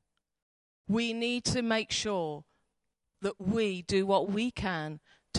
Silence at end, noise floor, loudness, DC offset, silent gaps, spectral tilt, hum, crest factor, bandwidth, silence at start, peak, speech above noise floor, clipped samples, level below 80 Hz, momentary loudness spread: 0 s; -82 dBFS; -31 LUFS; under 0.1%; none; -4.5 dB/octave; none; 18 dB; 11.5 kHz; 0.9 s; -14 dBFS; 51 dB; under 0.1%; -56 dBFS; 11 LU